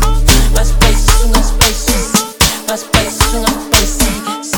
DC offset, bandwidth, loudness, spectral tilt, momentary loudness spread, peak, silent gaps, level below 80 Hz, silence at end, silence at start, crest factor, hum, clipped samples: under 0.1%; 19.5 kHz; -12 LUFS; -3 dB/octave; 4 LU; 0 dBFS; none; -14 dBFS; 0 s; 0 s; 10 dB; none; 0.4%